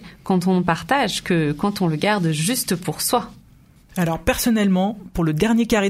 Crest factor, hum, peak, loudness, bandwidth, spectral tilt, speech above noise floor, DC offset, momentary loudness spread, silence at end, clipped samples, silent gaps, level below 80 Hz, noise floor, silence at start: 16 dB; none; -4 dBFS; -20 LUFS; 16 kHz; -5 dB/octave; 31 dB; under 0.1%; 6 LU; 0 s; under 0.1%; none; -42 dBFS; -50 dBFS; 0 s